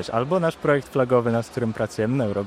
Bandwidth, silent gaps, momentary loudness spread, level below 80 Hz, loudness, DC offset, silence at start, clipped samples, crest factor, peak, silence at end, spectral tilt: 15 kHz; none; 5 LU; -56 dBFS; -23 LUFS; under 0.1%; 0 s; under 0.1%; 16 dB; -6 dBFS; 0 s; -7 dB/octave